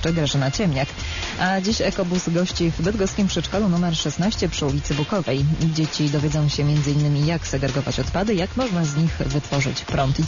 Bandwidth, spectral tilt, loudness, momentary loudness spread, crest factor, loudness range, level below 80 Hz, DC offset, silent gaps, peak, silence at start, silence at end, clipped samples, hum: 7.4 kHz; -5.5 dB/octave; -22 LUFS; 3 LU; 12 dB; 1 LU; -36 dBFS; under 0.1%; none; -8 dBFS; 0 s; 0 s; under 0.1%; none